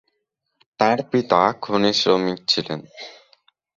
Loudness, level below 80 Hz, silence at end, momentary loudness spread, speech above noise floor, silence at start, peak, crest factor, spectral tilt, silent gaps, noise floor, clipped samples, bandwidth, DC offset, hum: -20 LUFS; -62 dBFS; 0.65 s; 17 LU; 56 dB; 0.8 s; -2 dBFS; 20 dB; -4.5 dB/octave; none; -76 dBFS; under 0.1%; 7.8 kHz; under 0.1%; none